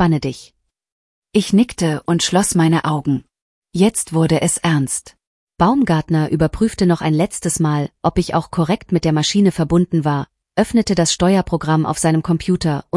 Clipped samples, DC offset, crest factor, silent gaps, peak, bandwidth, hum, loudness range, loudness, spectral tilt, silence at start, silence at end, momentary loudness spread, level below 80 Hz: under 0.1%; under 0.1%; 14 dB; 0.92-1.22 s, 3.42-3.62 s, 5.27-5.47 s; -2 dBFS; 12 kHz; none; 1 LU; -17 LUFS; -5.5 dB/octave; 0 s; 0 s; 6 LU; -40 dBFS